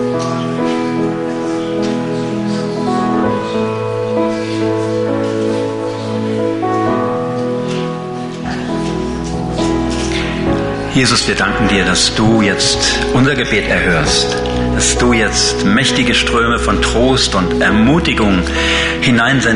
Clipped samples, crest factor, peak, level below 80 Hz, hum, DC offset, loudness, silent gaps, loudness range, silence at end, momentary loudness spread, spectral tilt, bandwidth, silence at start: under 0.1%; 12 dB; -2 dBFS; -28 dBFS; none; under 0.1%; -14 LUFS; none; 6 LU; 0 s; 8 LU; -4 dB/octave; 11 kHz; 0 s